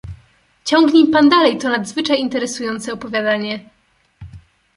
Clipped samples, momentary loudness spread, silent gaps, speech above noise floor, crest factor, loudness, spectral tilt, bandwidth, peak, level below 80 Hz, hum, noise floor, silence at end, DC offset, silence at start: under 0.1%; 15 LU; none; 37 dB; 16 dB; -16 LUFS; -4 dB/octave; 11.5 kHz; -2 dBFS; -48 dBFS; none; -52 dBFS; 0.4 s; under 0.1%; 0.05 s